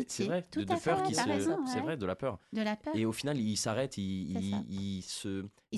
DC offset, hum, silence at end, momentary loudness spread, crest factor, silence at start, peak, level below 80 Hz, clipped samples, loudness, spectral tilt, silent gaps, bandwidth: under 0.1%; none; 0 s; 7 LU; 16 dB; 0 s; -18 dBFS; -60 dBFS; under 0.1%; -34 LUFS; -5 dB/octave; none; 12.5 kHz